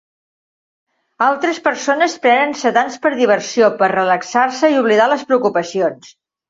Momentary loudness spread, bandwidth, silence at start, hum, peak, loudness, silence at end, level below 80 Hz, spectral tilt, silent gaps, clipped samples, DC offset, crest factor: 5 LU; 7.8 kHz; 1.2 s; none; -2 dBFS; -15 LUFS; 0.45 s; -66 dBFS; -4 dB/octave; none; under 0.1%; under 0.1%; 14 dB